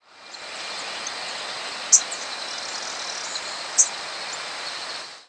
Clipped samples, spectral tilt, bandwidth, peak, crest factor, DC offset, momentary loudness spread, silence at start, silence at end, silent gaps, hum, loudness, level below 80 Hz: under 0.1%; 2.5 dB/octave; 11 kHz; -4 dBFS; 24 dB; under 0.1%; 15 LU; 0.1 s; 0.05 s; none; none; -24 LUFS; -76 dBFS